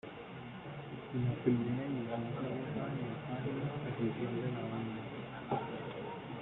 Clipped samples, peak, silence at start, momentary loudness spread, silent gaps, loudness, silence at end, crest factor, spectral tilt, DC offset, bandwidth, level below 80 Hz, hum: under 0.1%; -18 dBFS; 0.05 s; 12 LU; none; -39 LUFS; 0 s; 22 dB; -10.5 dB/octave; under 0.1%; 4.1 kHz; -66 dBFS; none